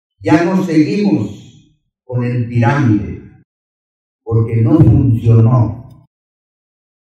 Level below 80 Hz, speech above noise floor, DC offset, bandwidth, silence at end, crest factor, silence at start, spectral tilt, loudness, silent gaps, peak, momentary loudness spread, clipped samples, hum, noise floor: -36 dBFS; 42 dB; under 0.1%; 7.4 kHz; 1.25 s; 14 dB; 0.2 s; -9 dB/octave; -13 LUFS; 3.45-4.19 s; 0 dBFS; 15 LU; 0.2%; none; -54 dBFS